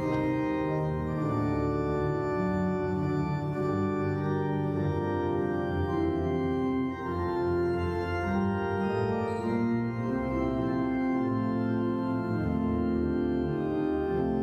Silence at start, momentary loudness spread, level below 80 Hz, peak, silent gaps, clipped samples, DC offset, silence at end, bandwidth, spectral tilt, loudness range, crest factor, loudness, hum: 0 s; 2 LU; -46 dBFS; -16 dBFS; none; under 0.1%; under 0.1%; 0 s; 8.8 kHz; -9 dB/octave; 0 LU; 12 dB; -29 LUFS; none